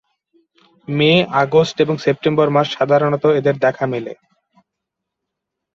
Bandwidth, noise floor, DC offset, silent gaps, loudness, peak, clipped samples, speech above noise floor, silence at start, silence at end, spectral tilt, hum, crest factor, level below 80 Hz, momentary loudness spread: 7.4 kHz; -80 dBFS; under 0.1%; none; -16 LUFS; -2 dBFS; under 0.1%; 64 dB; 0.9 s; 1.65 s; -6.5 dB/octave; none; 16 dB; -58 dBFS; 9 LU